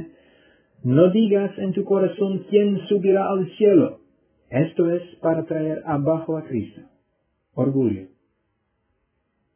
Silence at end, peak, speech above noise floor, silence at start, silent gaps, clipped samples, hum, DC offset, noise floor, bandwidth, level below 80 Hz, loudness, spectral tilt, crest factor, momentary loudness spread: 1.5 s; -2 dBFS; 52 dB; 0 s; none; under 0.1%; none; under 0.1%; -72 dBFS; 3.5 kHz; -60 dBFS; -21 LUFS; -12 dB/octave; 20 dB; 12 LU